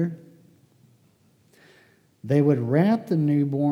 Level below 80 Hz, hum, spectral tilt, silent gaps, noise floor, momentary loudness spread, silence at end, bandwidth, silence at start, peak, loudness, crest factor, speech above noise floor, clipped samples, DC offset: -78 dBFS; none; -9.5 dB/octave; none; -61 dBFS; 15 LU; 0 s; 11 kHz; 0 s; -8 dBFS; -22 LUFS; 18 dB; 40 dB; under 0.1%; under 0.1%